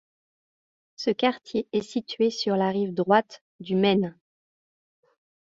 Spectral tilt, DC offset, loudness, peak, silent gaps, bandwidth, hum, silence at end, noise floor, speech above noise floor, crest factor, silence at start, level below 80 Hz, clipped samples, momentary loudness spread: -6 dB/octave; under 0.1%; -25 LUFS; -6 dBFS; 3.41-3.59 s; 7.8 kHz; none; 1.3 s; under -90 dBFS; over 65 dB; 22 dB; 1 s; -68 dBFS; under 0.1%; 10 LU